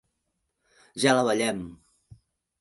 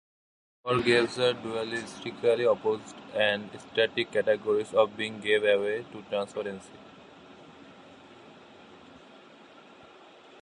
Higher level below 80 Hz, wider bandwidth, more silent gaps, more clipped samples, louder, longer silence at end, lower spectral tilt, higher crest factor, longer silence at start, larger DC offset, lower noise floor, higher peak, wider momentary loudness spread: about the same, -64 dBFS vs -68 dBFS; about the same, 12 kHz vs 11 kHz; neither; neither; first, -25 LUFS vs -28 LUFS; second, 0.85 s vs 1.45 s; about the same, -4 dB/octave vs -4.5 dB/octave; about the same, 22 dB vs 20 dB; first, 0.95 s vs 0.65 s; neither; first, -79 dBFS vs -53 dBFS; first, -6 dBFS vs -10 dBFS; first, 20 LU vs 12 LU